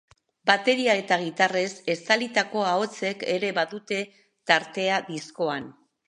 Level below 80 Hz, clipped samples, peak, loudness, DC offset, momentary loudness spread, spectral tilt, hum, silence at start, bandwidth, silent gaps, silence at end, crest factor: -76 dBFS; under 0.1%; -2 dBFS; -25 LUFS; under 0.1%; 9 LU; -3.5 dB/octave; none; 0.45 s; 11.5 kHz; none; 0.35 s; 24 dB